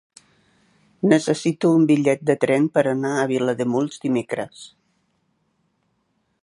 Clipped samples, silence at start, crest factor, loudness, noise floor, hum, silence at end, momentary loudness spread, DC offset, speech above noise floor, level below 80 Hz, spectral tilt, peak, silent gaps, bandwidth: under 0.1%; 1.05 s; 20 dB; -20 LUFS; -69 dBFS; none; 1.75 s; 8 LU; under 0.1%; 50 dB; -70 dBFS; -6.5 dB/octave; -2 dBFS; none; 11.5 kHz